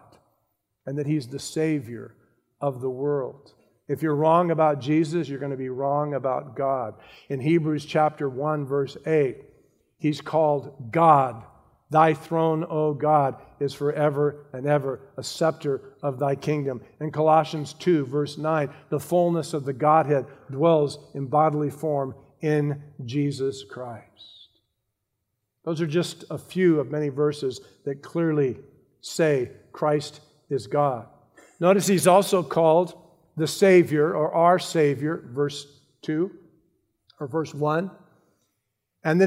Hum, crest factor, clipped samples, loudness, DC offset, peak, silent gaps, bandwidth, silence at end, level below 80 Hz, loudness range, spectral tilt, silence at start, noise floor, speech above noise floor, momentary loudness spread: none; 20 dB; under 0.1%; -24 LUFS; under 0.1%; -4 dBFS; none; 16 kHz; 0 s; -70 dBFS; 8 LU; -6.5 dB/octave; 0.85 s; -79 dBFS; 56 dB; 14 LU